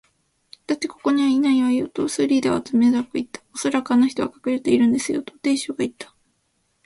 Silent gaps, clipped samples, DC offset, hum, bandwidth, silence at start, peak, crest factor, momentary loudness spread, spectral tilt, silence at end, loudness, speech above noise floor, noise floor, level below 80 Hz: none; under 0.1%; under 0.1%; none; 11.5 kHz; 0.7 s; -6 dBFS; 16 dB; 10 LU; -4.5 dB/octave; 0.8 s; -21 LUFS; 48 dB; -69 dBFS; -60 dBFS